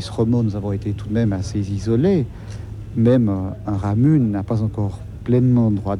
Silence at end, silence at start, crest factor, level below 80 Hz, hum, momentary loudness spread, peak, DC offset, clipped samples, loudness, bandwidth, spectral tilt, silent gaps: 0 s; 0 s; 14 dB; -38 dBFS; none; 11 LU; -4 dBFS; under 0.1%; under 0.1%; -19 LUFS; 10.5 kHz; -9 dB/octave; none